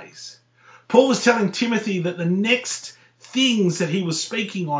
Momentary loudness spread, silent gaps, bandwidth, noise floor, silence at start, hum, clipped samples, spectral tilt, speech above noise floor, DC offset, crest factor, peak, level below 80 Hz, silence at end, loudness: 13 LU; none; 8 kHz; -52 dBFS; 0 s; none; under 0.1%; -4.5 dB/octave; 31 dB; under 0.1%; 20 dB; -2 dBFS; -74 dBFS; 0 s; -20 LUFS